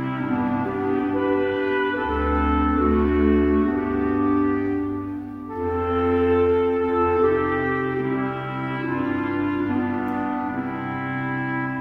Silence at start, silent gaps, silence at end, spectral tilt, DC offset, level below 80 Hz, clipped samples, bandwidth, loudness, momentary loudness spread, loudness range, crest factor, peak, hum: 0 s; none; 0 s; -9.5 dB/octave; under 0.1%; -36 dBFS; under 0.1%; 5.2 kHz; -23 LUFS; 8 LU; 4 LU; 14 dB; -8 dBFS; none